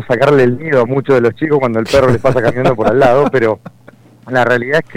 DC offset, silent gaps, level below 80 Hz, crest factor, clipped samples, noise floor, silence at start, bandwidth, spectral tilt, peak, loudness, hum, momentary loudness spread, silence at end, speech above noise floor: under 0.1%; none; -40 dBFS; 12 dB; under 0.1%; -42 dBFS; 0 s; 15.5 kHz; -7 dB/octave; 0 dBFS; -12 LUFS; none; 5 LU; 0 s; 30 dB